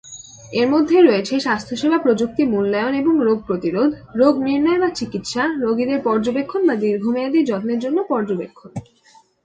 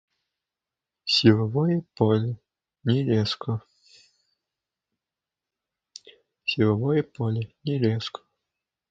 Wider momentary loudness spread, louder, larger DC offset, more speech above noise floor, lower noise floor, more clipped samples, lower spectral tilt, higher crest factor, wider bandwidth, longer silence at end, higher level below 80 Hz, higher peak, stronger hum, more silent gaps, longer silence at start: second, 10 LU vs 13 LU; first, -18 LUFS vs -25 LUFS; neither; second, 35 dB vs 66 dB; second, -53 dBFS vs -89 dBFS; neither; second, -5.5 dB/octave vs -7 dB/octave; second, 18 dB vs 24 dB; first, 9.2 kHz vs 7.8 kHz; second, 0.65 s vs 0.8 s; about the same, -56 dBFS vs -60 dBFS; about the same, -2 dBFS vs -4 dBFS; neither; neither; second, 0.05 s vs 1.05 s